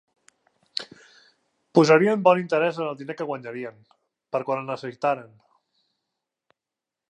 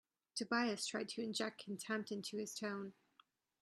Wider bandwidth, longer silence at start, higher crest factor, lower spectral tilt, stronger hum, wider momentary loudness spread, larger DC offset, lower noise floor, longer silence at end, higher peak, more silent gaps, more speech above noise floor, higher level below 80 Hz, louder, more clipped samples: second, 11.5 kHz vs 13 kHz; first, 0.75 s vs 0.35 s; about the same, 22 dB vs 20 dB; first, -6 dB/octave vs -3 dB/octave; neither; first, 17 LU vs 10 LU; neither; first, -88 dBFS vs -74 dBFS; first, 1.85 s vs 0.7 s; first, -4 dBFS vs -24 dBFS; neither; first, 65 dB vs 31 dB; first, -80 dBFS vs -88 dBFS; first, -23 LUFS vs -42 LUFS; neither